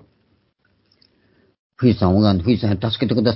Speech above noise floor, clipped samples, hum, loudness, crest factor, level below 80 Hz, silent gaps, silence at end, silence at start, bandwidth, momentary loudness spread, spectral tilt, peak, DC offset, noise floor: 47 dB; under 0.1%; none; -18 LUFS; 18 dB; -38 dBFS; none; 0 s; 1.8 s; 5.8 kHz; 5 LU; -12 dB/octave; -2 dBFS; under 0.1%; -64 dBFS